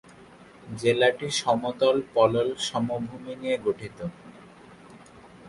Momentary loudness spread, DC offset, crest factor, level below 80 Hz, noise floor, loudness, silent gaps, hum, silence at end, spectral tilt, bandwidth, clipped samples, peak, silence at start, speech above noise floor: 14 LU; under 0.1%; 20 dB; -62 dBFS; -50 dBFS; -25 LUFS; none; none; 0 s; -4.5 dB/octave; 11.5 kHz; under 0.1%; -8 dBFS; 0.2 s; 25 dB